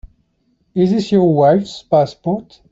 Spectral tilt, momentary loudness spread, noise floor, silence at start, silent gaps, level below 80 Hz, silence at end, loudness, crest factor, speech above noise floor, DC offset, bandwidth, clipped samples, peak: -8 dB/octave; 11 LU; -62 dBFS; 0.05 s; none; -48 dBFS; 0.3 s; -15 LUFS; 14 dB; 48 dB; under 0.1%; 7.8 kHz; under 0.1%; -2 dBFS